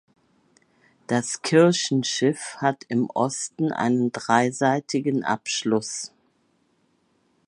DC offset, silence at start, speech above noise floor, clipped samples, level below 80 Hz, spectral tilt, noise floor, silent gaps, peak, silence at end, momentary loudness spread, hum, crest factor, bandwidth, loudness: under 0.1%; 1.1 s; 44 dB; under 0.1%; -70 dBFS; -4.5 dB/octave; -67 dBFS; none; -2 dBFS; 1.4 s; 8 LU; none; 22 dB; 11.5 kHz; -23 LUFS